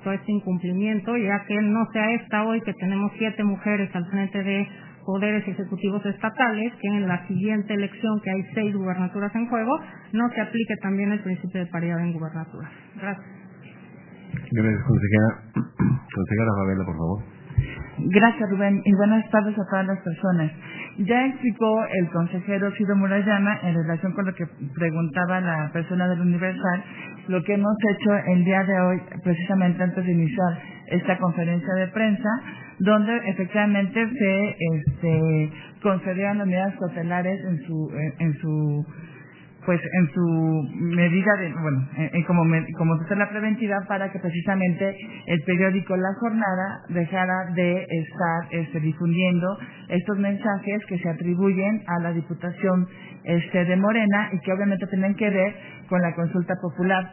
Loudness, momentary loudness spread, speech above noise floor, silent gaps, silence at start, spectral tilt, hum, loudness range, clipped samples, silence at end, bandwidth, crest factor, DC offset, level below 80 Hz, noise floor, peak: -24 LUFS; 8 LU; 23 dB; none; 0 s; -11.5 dB/octave; none; 4 LU; under 0.1%; 0 s; 3.2 kHz; 20 dB; under 0.1%; -52 dBFS; -46 dBFS; -2 dBFS